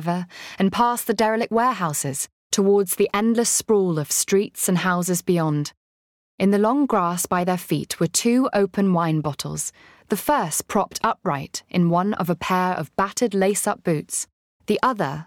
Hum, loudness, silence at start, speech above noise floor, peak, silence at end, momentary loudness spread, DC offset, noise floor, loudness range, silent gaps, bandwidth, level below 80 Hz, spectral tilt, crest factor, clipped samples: none; -21 LUFS; 0 s; over 69 dB; -8 dBFS; 0.05 s; 8 LU; under 0.1%; under -90 dBFS; 3 LU; 2.32-2.50 s, 5.77-6.38 s, 14.33-14.60 s; 18.5 kHz; -58 dBFS; -4.5 dB/octave; 14 dB; under 0.1%